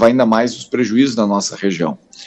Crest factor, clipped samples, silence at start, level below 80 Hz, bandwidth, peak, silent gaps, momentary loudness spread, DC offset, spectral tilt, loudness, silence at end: 14 dB; under 0.1%; 0 s; -56 dBFS; 8.4 kHz; 0 dBFS; none; 6 LU; under 0.1%; -5 dB/octave; -16 LUFS; 0 s